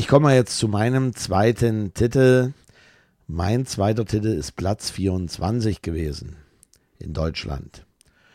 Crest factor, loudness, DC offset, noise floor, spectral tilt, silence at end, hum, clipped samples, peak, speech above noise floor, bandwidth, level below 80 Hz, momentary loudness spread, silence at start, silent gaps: 20 dB; -22 LUFS; under 0.1%; -58 dBFS; -6 dB/octave; 0.55 s; none; under 0.1%; -2 dBFS; 38 dB; 14.5 kHz; -40 dBFS; 15 LU; 0 s; none